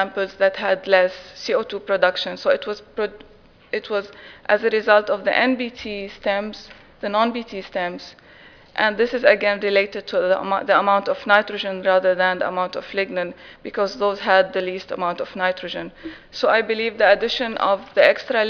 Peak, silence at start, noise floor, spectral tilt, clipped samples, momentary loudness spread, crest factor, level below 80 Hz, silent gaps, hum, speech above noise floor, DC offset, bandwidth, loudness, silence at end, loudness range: 0 dBFS; 0 s; -47 dBFS; -4.5 dB/octave; under 0.1%; 14 LU; 20 dB; -56 dBFS; none; none; 26 dB; under 0.1%; 5.4 kHz; -20 LUFS; 0 s; 5 LU